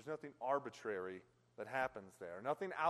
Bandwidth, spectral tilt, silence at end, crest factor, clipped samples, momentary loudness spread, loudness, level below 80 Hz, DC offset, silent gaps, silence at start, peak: 13 kHz; -5.5 dB/octave; 0 s; 20 dB; under 0.1%; 12 LU; -44 LUFS; -80 dBFS; under 0.1%; none; 0 s; -24 dBFS